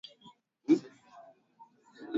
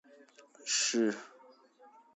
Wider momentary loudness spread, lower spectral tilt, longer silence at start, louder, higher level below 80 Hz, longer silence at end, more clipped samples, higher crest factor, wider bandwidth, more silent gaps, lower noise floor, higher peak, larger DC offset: first, 26 LU vs 17 LU; first, -5.5 dB/octave vs -1.5 dB/octave; about the same, 0.7 s vs 0.6 s; about the same, -31 LUFS vs -31 LUFS; first, -84 dBFS vs -90 dBFS; second, 0 s vs 0.3 s; neither; about the same, 22 dB vs 18 dB; about the same, 7.6 kHz vs 8.2 kHz; neither; about the same, -61 dBFS vs -61 dBFS; first, -14 dBFS vs -20 dBFS; neither